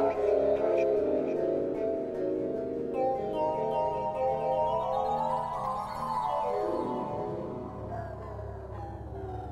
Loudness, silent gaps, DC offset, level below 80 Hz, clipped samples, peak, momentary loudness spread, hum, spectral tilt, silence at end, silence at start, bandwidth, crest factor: -31 LUFS; none; under 0.1%; -52 dBFS; under 0.1%; -14 dBFS; 13 LU; none; -8 dB/octave; 0 s; 0 s; 12.5 kHz; 16 dB